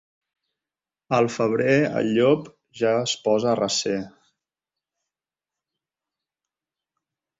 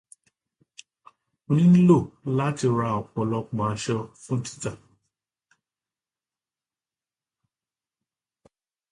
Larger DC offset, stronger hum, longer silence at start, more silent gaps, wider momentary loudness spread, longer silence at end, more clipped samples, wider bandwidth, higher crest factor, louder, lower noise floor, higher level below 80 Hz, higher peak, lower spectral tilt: neither; neither; second, 1.1 s vs 1.5 s; neither; second, 6 LU vs 14 LU; second, 3.3 s vs 4.15 s; neither; second, 8 kHz vs 11 kHz; about the same, 20 dB vs 20 dB; about the same, -22 LUFS vs -24 LUFS; about the same, under -90 dBFS vs under -90 dBFS; second, -66 dBFS vs -60 dBFS; about the same, -6 dBFS vs -6 dBFS; second, -4.5 dB/octave vs -7.5 dB/octave